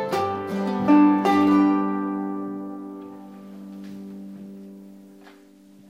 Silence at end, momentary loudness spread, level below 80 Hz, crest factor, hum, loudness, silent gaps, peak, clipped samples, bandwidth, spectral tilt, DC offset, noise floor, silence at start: 0.85 s; 24 LU; -68 dBFS; 16 dB; none; -21 LUFS; none; -6 dBFS; under 0.1%; 10 kHz; -7.5 dB/octave; under 0.1%; -50 dBFS; 0 s